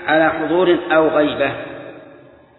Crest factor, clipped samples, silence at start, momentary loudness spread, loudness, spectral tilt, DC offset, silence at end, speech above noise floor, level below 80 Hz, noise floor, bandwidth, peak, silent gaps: 16 dB; under 0.1%; 0 s; 18 LU; -16 LUFS; -9 dB/octave; under 0.1%; 0.5 s; 29 dB; -52 dBFS; -44 dBFS; 4.1 kHz; -2 dBFS; none